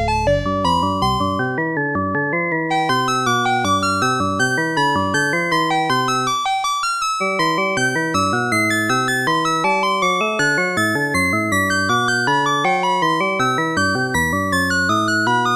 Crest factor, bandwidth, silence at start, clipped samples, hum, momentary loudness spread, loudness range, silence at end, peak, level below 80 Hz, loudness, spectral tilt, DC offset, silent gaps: 12 dB; 14.5 kHz; 0 s; under 0.1%; none; 2 LU; 1 LU; 0 s; -6 dBFS; -40 dBFS; -17 LUFS; -4 dB/octave; under 0.1%; none